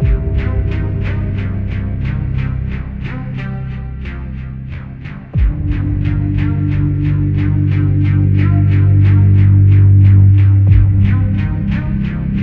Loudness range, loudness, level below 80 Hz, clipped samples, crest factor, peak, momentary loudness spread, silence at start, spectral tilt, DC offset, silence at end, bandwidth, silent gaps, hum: 12 LU; -14 LUFS; -22 dBFS; under 0.1%; 12 dB; 0 dBFS; 16 LU; 0 s; -11 dB/octave; under 0.1%; 0 s; 3.6 kHz; none; none